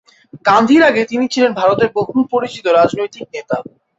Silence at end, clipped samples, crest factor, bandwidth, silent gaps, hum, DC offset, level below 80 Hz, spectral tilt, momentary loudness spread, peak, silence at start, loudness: 0.35 s; under 0.1%; 14 dB; 8 kHz; none; none; under 0.1%; -54 dBFS; -5 dB/octave; 13 LU; 0 dBFS; 0.35 s; -14 LUFS